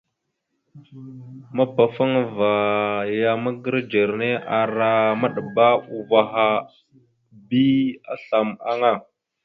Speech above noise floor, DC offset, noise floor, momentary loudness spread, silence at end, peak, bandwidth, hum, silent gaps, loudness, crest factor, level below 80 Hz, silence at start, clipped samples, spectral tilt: 56 dB; under 0.1%; -77 dBFS; 8 LU; 0.45 s; -2 dBFS; 5.8 kHz; none; none; -21 LUFS; 20 dB; -66 dBFS; 0.75 s; under 0.1%; -8.5 dB/octave